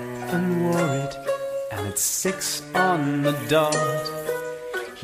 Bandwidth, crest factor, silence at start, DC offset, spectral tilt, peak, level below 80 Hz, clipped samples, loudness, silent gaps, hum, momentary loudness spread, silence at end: 15.5 kHz; 18 dB; 0 s; under 0.1%; -4 dB/octave; -8 dBFS; -58 dBFS; under 0.1%; -24 LUFS; none; none; 8 LU; 0 s